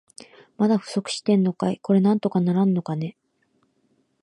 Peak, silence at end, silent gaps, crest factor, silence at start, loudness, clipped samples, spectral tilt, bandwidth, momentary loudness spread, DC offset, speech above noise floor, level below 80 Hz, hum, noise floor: -8 dBFS; 1.1 s; none; 16 dB; 0.6 s; -22 LUFS; under 0.1%; -7 dB/octave; 11 kHz; 9 LU; under 0.1%; 46 dB; -70 dBFS; none; -68 dBFS